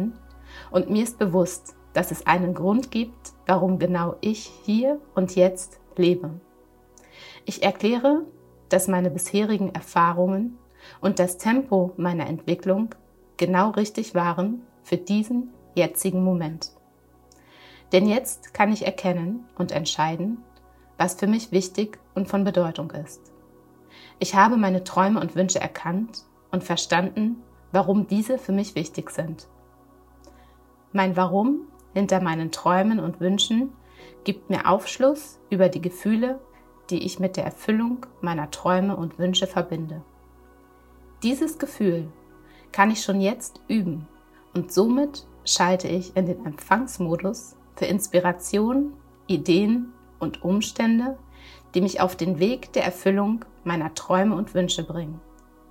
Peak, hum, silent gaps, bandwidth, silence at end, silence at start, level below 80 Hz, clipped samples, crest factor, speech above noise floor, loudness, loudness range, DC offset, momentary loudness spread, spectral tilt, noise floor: -2 dBFS; none; none; 16 kHz; 0.5 s; 0 s; -56 dBFS; under 0.1%; 22 dB; 33 dB; -24 LUFS; 3 LU; under 0.1%; 11 LU; -5 dB/octave; -56 dBFS